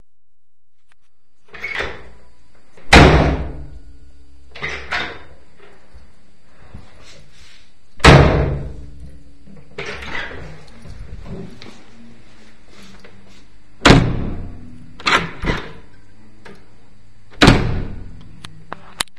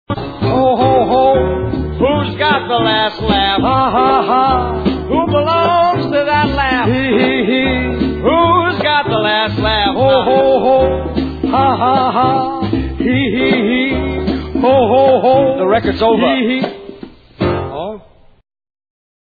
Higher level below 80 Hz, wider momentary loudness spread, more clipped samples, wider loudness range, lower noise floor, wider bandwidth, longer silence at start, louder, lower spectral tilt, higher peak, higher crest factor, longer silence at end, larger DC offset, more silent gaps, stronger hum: about the same, -28 dBFS vs -30 dBFS; first, 28 LU vs 7 LU; first, 0.2% vs under 0.1%; first, 16 LU vs 2 LU; first, -72 dBFS vs -36 dBFS; first, 12 kHz vs 4.9 kHz; first, 1.55 s vs 0.1 s; about the same, -15 LUFS vs -13 LUFS; second, -5 dB/octave vs -8.5 dB/octave; about the same, 0 dBFS vs 0 dBFS; first, 20 dB vs 12 dB; second, 0.15 s vs 1.4 s; first, 3% vs under 0.1%; neither; neither